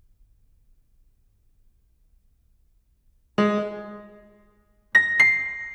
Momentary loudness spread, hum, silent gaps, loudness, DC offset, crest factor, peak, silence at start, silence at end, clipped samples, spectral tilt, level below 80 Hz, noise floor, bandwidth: 22 LU; none; none; -20 LUFS; under 0.1%; 22 dB; -6 dBFS; 3.4 s; 0 s; under 0.1%; -5 dB/octave; -60 dBFS; -63 dBFS; 12 kHz